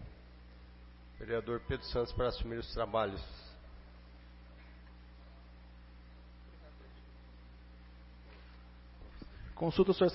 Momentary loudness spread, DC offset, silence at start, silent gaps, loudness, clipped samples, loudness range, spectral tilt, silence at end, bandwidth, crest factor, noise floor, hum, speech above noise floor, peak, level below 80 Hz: 22 LU; under 0.1%; 0 s; none; -36 LUFS; under 0.1%; 18 LU; -5 dB/octave; 0 s; 5.8 kHz; 22 dB; -55 dBFS; 60 Hz at -55 dBFS; 21 dB; -16 dBFS; -50 dBFS